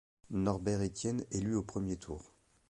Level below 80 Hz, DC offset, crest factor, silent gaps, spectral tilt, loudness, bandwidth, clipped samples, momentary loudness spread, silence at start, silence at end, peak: -54 dBFS; under 0.1%; 20 dB; none; -6.5 dB/octave; -36 LUFS; 11.5 kHz; under 0.1%; 9 LU; 0.3 s; 0.45 s; -18 dBFS